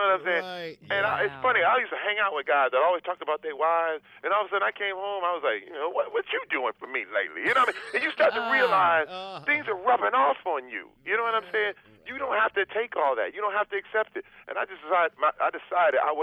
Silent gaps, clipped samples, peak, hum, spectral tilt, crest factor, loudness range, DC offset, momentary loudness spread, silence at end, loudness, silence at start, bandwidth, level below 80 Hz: none; under 0.1%; -10 dBFS; none; -4 dB/octave; 16 dB; 4 LU; under 0.1%; 10 LU; 0 s; -26 LUFS; 0 s; 12.5 kHz; -72 dBFS